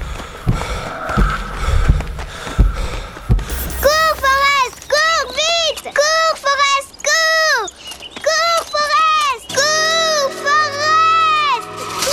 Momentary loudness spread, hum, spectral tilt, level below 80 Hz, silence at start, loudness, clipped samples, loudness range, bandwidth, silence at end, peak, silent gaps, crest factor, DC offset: 12 LU; none; -2.5 dB/octave; -24 dBFS; 0 s; -15 LUFS; under 0.1%; 6 LU; over 20 kHz; 0 s; 0 dBFS; none; 16 dB; under 0.1%